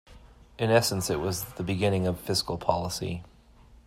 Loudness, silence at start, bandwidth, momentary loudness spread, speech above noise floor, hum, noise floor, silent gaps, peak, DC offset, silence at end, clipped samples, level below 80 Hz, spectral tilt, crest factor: -28 LUFS; 0.1 s; 16 kHz; 9 LU; 27 dB; none; -54 dBFS; none; -8 dBFS; under 0.1%; 0.65 s; under 0.1%; -52 dBFS; -4.5 dB/octave; 22 dB